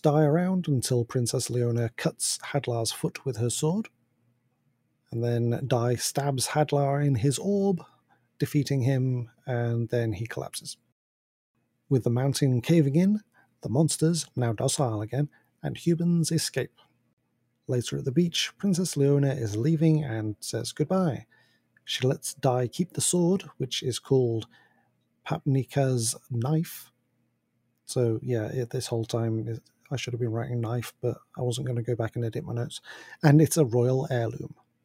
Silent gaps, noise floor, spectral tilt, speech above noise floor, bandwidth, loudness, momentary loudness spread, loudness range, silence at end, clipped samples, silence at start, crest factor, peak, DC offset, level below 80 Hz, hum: 10.92-11.54 s, 17.13-17.17 s; -74 dBFS; -5.5 dB/octave; 48 dB; 16 kHz; -27 LUFS; 11 LU; 5 LU; 0.35 s; under 0.1%; 0.05 s; 24 dB; -4 dBFS; under 0.1%; -66 dBFS; none